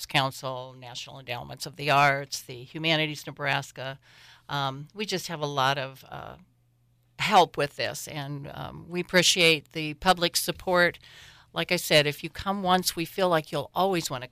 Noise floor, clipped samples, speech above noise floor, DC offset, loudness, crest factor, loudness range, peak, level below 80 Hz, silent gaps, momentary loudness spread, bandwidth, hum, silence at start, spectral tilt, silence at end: -66 dBFS; under 0.1%; 38 dB; under 0.1%; -26 LUFS; 18 dB; 6 LU; -10 dBFS; -58 dBFS; none; 17 LU; 16 kHz; none; 0 s; -3.5 dB/octave; 0.05 s